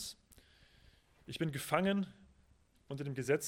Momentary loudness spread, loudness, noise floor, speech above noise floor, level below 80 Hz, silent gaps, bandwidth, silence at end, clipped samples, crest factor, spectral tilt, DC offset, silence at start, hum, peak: 17 LU; -38 LUFS; -69 dBFS; 33 dB; -68 dBFS; none; 16.5 kHz; 0 s; under 0.1%; 24 dB; -5 dB/octave; under 0.1%; 0 s; none; -16 dBFS